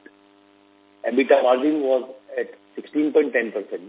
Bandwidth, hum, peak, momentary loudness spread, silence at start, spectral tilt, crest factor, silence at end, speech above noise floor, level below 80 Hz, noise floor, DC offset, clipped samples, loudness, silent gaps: 4 kHz; none; -4 dBFS; 14 LU; 1.05 s; -8 dB/octave; 18 dB; 0 s; 34 dB; -80 dBFS; -55 dBFS; under 0.1%; under 0.1%; -21 LUFS; none